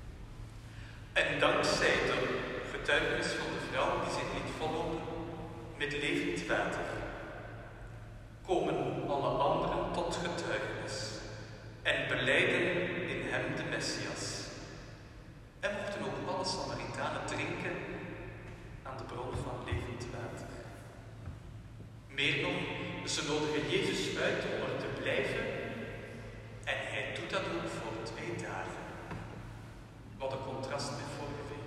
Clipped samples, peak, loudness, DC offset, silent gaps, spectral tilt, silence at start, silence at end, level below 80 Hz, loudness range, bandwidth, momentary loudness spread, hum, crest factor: under 0.1%; -14 dBFS; -35 LUFS; under 0.1%; none; -4 dB/octave; 0 s; 0 s; -54 dBFS; 9 LU; 14 kHz; 18 LU; none; 22 dB